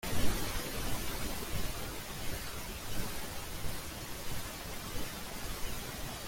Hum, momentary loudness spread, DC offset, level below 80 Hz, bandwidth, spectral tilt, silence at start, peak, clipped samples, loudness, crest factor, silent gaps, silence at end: none; 5 LU; under 0.1%; -44 dBFS; 17 kHz; -3.5 dB/octave; 0.05 s; -16 dBFS; under 0.1%; -40 LUFS; 20 dB; none; 0 s